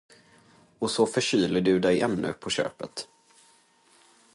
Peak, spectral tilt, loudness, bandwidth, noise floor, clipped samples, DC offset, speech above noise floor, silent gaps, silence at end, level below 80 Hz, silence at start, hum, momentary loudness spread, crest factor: -10 dBFS; -4.5 dB/octave; -26 LUFS; 11.5 kHz; -61 dBFS; under 0.1%; under 0.1%; 36 dB; none; 1.3 s; -60 dBFS; 0.8 s; none; 14 LU; 18 dB